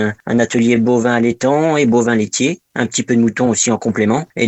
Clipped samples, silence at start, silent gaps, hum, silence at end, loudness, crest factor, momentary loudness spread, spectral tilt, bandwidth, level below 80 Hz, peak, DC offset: under 0.1%; 0 s; none; none; 0 s; -15 LUFS; 14 dB; 4 LU; -4.5 dB/octave; 8.4 kHz; -54 dBFS; 0 dBFS; under 0.1%